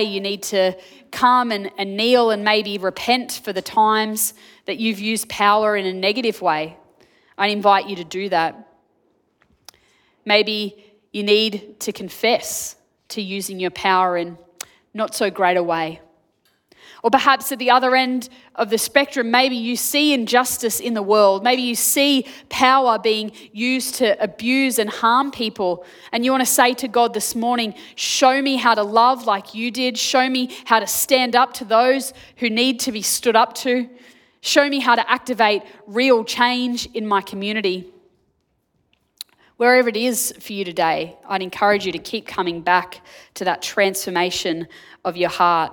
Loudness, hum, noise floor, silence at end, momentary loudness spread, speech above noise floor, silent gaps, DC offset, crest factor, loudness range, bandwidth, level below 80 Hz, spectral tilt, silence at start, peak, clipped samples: -19 LUFS; none; -68 dBFS; 0 s; 12 LU; 49 dB; none; under 0.1%; 20 dB; 5 LU; 19 kHz; -64 dBFS; -2.5 dB/octave; 0 s; 0 dBFS; under 0.1%